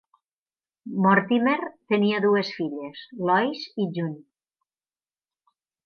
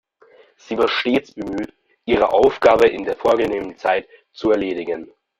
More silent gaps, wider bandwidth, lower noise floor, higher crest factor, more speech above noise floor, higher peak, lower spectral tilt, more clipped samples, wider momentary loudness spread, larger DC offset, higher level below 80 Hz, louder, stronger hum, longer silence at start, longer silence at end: neither; second, 6.6 kHz vs 13 kHz; first, under -90 dBFS vs -51 dBFS; about the same, 20 dB vs 18 dB; first, over 66 dB vs 33 dB; second, -6 dBFS vs -2 dBFS; first, -7.5 dB/octave vs -5.5 dB/octave; neither; about the same, 14 LU vs 14 LU; neither; second, -78 dBFS vs -50 dBFS; second, -24 LUFS vs -19 LUFS; neither; first, 0.85 s vs 0.7 s; first, 1.7 s vs 0.35 s